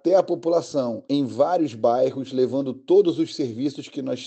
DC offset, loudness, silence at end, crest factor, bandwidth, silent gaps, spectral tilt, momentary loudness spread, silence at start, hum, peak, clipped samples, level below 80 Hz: under 0.1%; -23 LUFS; 0 s; 16 dB; 8.6 kHz; none; -6.5 dB/octave; 9 LU; 0.05 s; none; -6 dBFS; under 0.1%; -76 dBFS